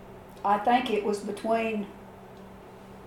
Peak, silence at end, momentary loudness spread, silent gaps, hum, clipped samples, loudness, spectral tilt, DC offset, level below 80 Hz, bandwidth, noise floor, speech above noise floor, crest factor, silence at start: -12 dBFS; 0 s; 23 LU; none; none; under 0.1%; -27 LUFS; -5 dB/octave; under 0.1%; -60 dBFS; 16.5 kHz; -47 dBFS; 20 dB; 18 dB; 0 s